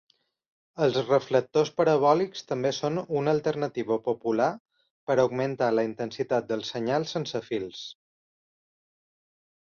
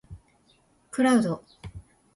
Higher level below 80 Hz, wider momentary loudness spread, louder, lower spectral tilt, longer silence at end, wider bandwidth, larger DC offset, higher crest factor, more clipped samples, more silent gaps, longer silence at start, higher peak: second, -70 dBFS vs -54 dBFS; second, 9 LU vs 23 LU; about the same, -27 LUFS vs -25 LUFS; about the same, -6 dB/octave vs -5.5 dB/octave; first, 1.7 s vs 0.35 s; second, 7 kHz vs 11.5 kHz; neither; about the same, 20 dB vs 18 dB; neither; first, 4.60-4.65 s, 4.90-5.07 s vs none; first, 0.75 s vs 0.1 s; first, -8 dBFS vs -12 dBFS